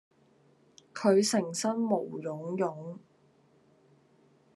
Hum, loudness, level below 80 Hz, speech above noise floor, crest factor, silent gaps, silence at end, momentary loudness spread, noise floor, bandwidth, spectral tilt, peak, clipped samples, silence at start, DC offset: none; -30 LUFS; -82 dBFS; 36 dB; 20 dB; none; 1.55 s; 20 LU; -65 dBFS; 12.5 kHz; -4.5 dB/octave; -12 dBFS; under 0.1%; 0.95 s; under 0.1%